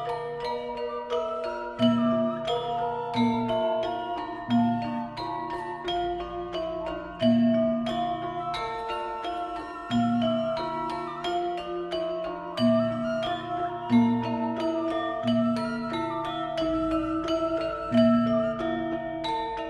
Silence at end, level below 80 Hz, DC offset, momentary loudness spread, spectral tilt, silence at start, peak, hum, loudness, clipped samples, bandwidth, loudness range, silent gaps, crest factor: 0 s; -54 dBFS; under 0.1%; 9 LU; -7 dB/octave; 0 s; -10 dBFS; none; -28 LUFS; under 0.1%; 9.6 kHz; 3 LU; none; 18 dB